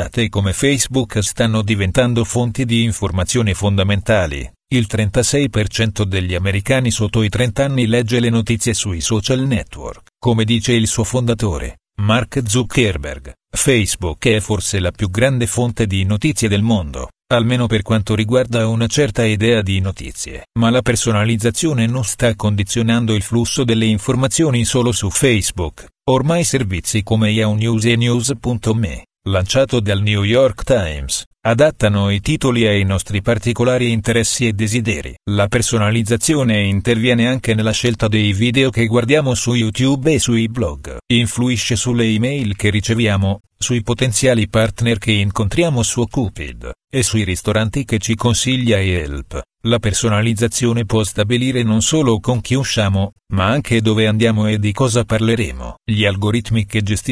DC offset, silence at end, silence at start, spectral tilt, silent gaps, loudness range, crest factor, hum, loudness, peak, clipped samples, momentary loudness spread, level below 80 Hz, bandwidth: under 0.1%; 0 s; 0 s; -5 dB/octave; 31.26-31.31 s; 2 LU; 16 dB; none; -16 LUFS; 0 dBFS; under 0.1%; 6 LU; -34 dBFS; 11 kHz